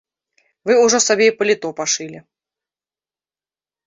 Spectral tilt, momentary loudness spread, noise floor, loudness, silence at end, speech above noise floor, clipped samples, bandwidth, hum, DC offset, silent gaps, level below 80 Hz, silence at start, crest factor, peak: -1.5 dB/octave; 11 LU; under -90 dBFS; -16 LUFS; 1.65 s; over 74 dB; under 0.1%; 7.8 kHz; none; under 0.1%; none; -68 dBFS; 0.65 s; 18 dB; 0 dBFS